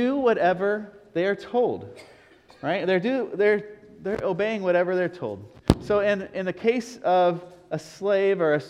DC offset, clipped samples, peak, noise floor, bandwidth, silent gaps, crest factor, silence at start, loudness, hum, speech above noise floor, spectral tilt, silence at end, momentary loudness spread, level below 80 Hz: under 0.1%; under 0.1%; 0 dBFS; -53 dBFS; 12 kHz; none; 24 dB; 0 s; -25 LUFS; none; 29 dB; -6.5 dB/octave; 0 s; 13 LU; -46 dBFS